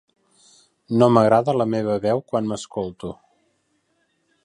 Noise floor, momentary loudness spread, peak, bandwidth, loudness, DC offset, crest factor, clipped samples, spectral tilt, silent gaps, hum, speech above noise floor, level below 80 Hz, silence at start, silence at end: -68 dBFS; 15 LU; -2 dBFS; 11.5 kHz; -20 LUFS; under 0.1%; 22 dB; under 0.1%; -7 dB/octave; none; none; 49 dB; -58 dBFS; 0.9 s; 1.3 s